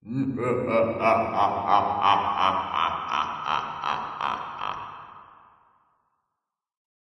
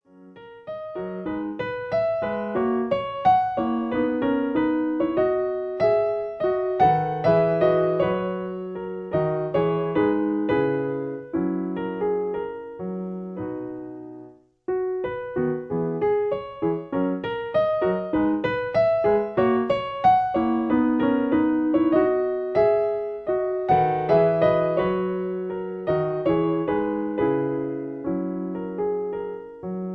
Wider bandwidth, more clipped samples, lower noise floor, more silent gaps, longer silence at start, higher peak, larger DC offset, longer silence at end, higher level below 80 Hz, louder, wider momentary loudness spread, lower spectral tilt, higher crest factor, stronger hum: first, 11 kHz vs 5.8 kHz; neither; first, -85 dBFS vs -47 dBFS; neither; second, 0.05 s vs 0.2 s; about the same, -6 dBFS vs -6 dBFS; neither; first, 1.85 s vs 0 s; second, -64 dBFS vs -54 dBFS; about the same, -25 LUFS vs -24 LUFS; about the same, 11 LU vs 12 LU; second, -6 dB/octave vs -9.5 dB/octave; about the same, 20 dB vs 16 dB; neither